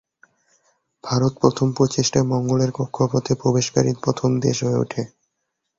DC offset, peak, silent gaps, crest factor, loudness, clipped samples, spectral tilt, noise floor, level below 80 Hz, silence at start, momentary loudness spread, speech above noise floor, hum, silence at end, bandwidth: under 0.1%; -2 dBFS; none; 20 dB; -20 LUFS; under 0.1%; -6 dB/octave; -77 dBFS; -52 dBFS; 1.05 s; 5 LU; 57 dB; none; 0.7 s; 7.8 kHz